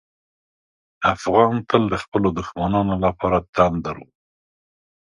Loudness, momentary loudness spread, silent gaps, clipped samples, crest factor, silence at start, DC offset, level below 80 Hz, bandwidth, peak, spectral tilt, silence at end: -20 LUFS; 7 LU; 2.08-2.12 s, 3.49-3.53 s; under 0.1%; 22 dB; 1 s; under 0.1%; -44 dBFS; 11 kHz; 0 dBFS; -7 dB/octave; 1.05 s